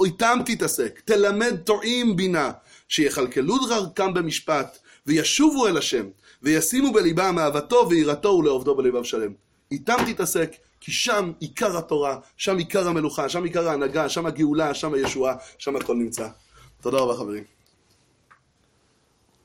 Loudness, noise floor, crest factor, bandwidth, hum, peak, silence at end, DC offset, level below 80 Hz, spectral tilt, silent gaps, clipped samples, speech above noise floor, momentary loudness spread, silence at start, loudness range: -23 LUFS; -64 dBFS; 16 dB; 16.5 kHz; none; -6 dBFS; 2 s; under 0.1%; -56 dBFS; -4 dB/octave; none; under 0.1%; 42 dB; 9 LU; 0 s; 6 LU